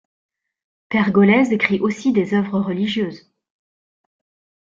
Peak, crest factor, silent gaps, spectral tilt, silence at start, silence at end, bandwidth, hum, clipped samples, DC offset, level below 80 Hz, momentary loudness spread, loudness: -2 dBFS; 18 dB; none; -7 dB/octave; 0.9 s; 1.45 s; 7.6 kHz; none; under 0.1%; under 0.1%; -60 dBFS; 9 LU; -18 LUFS